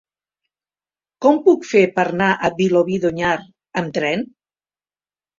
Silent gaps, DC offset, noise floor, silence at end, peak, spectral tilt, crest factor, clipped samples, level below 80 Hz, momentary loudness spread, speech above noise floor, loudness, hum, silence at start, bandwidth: none; under 0.1%; under -90 dBFS; 1.15 s; -2 dBFS; -6 dB/octave; 18 dB; under 0.1%; -58 dBFS; 10 LU; over 73 dB; -18 LUFS; 50 Hz at -50 dBFS; 1.2 s; 7.6 kHz